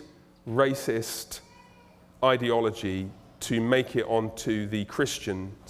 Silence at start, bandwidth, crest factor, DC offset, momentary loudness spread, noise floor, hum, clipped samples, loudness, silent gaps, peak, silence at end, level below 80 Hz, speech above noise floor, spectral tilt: 0 s; 16.5 kHz; 20 dB; under 0.1%; 12 LU; -55 dBFS; none; under 0.1%; -28 LUFS; none; -8 dBFS; 0 s; -58 dBFS; 28 dB; -5 dB/octave